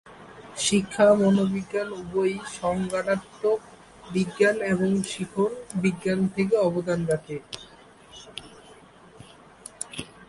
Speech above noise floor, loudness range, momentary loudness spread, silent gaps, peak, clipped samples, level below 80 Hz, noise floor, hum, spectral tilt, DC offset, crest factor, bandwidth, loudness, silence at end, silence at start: 26 dB; 6 LU; 20 LU; none; -8 dBFS; under 0.1%; -58 dBFS; -50 dBFS; none; -5 dB/octave; under 0.1%; 18 dB; 11.5 kHz; -25 LUFS; 0.05 s; 0.05 s